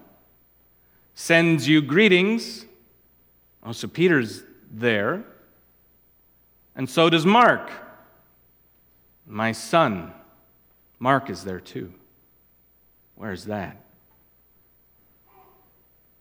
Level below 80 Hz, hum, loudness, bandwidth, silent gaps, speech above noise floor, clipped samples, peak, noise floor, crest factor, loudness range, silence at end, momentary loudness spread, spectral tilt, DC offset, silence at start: -66 dBFS; 60 Hz at -50 dBFS; -21 LUFS; 17 kHz; none; 39 dB; under 0.1%; -2 dBFS; -60 dBFS; 24 dB; 17 LU; 2.5 s; 22 LU; -5.5 dB/octave; under 0.1%; 1.2 s